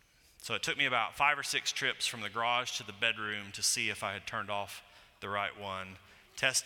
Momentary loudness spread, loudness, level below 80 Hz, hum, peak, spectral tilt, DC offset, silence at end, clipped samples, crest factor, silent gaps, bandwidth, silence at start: 13 LU; -33 LUFS; -70 dBFS; none; -14 dBFS; -1 dB/octave; under 0.1%; 0 s; under 0.1%; 22 dB; none; 18 kHz; 0.4 s